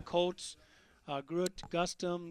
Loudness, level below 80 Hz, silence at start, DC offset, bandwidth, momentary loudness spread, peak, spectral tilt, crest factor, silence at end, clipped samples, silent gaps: -37 LUFS; -62 dBFS; 0 s; under 0.1%; 13.5 kHz; 14 LU; -18 dBFS; -4.5 dB/octave; 20 dB; 0 s; under 0.1%; none